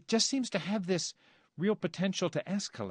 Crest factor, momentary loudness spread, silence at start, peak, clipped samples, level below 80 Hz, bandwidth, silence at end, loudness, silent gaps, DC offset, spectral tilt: 18 dB; 7 LU; 0.1 s; -16 dBFS; under 0.1%; -76 dBFS; 10 kHz; 0 s; -33 LUFS; none; under 0.1%; -4 dB/octave